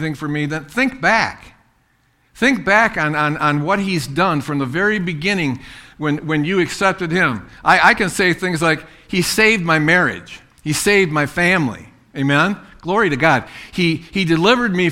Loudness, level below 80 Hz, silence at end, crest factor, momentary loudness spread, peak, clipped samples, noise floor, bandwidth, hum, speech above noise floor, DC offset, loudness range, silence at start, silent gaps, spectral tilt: -16 LUFS; -46 dBFS; 0 s; 18 dB; 9 LU; 0 dBFS; under 0.1%; -59 dBFS; 16.5 kHz; none; 42 dB; under 0.1%; 4 LU; 0 s; none; -4.5 dB/octave